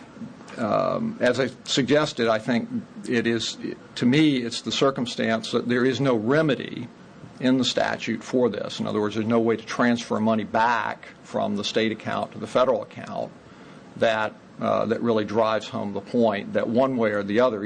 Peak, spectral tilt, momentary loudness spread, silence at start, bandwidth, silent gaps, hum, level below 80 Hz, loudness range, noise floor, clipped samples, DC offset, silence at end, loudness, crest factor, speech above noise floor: -8 dBFS; -5 dB/octave; 11 LU; 0 s; 9.8 kHz; none; none; -64 dBFS; 3 LU; -45 dBFS; under 0.1%; under 0.1%; 0 s; -24 LUFS; 16 dB; 22 dB